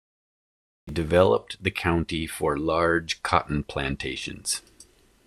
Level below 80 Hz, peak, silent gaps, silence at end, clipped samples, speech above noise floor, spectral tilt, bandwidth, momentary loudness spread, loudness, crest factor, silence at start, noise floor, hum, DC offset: -46 dBFS; -4 dBFS; none; 0.45 s; under 0.1%; 30 dB; -4.5 dB/octave; 13.5 kHz; 10 LU; -25 LUFS; 24 dB; 0.85 s; -55 dBFS; none; under 0.1%